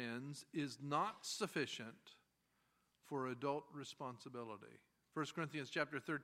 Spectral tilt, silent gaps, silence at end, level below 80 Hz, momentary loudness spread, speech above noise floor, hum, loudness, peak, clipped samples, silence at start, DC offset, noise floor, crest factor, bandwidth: -4.5 dB/octave; none; 0 s; -90 dBFS; 12 LU; 37 dB; none; -45 LUFS; -24 dBFS; under 0.1%; 0 s; under 0.1%; -82 dBFS; 22 dB; 16 kHz